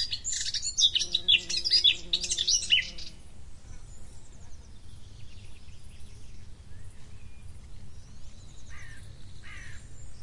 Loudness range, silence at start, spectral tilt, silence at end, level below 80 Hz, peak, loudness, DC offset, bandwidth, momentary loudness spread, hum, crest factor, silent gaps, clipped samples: 26 LU; 0 s; 1 dB/octave; 0 s; -50 dBFS; -10 dBFS; -24 LUFS; under 0.1%; 11.5 kHz; 27 LU; none; 22 dB; none; under 0.1%